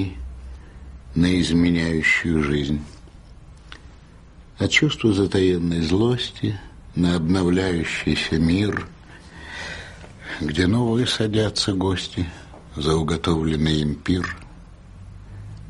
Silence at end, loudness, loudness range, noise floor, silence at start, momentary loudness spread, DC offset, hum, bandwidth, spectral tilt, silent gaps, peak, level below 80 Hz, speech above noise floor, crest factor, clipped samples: 0 s; -21 LUFS; 3 LU; -45 dBFS; 0 s; 21 LU; under 0.1%; none; 11.5 kHz; -5.5 dB/octave; none; -4 dBFS; -38 dBFS; 25 dB; 18 dB; under 0.1%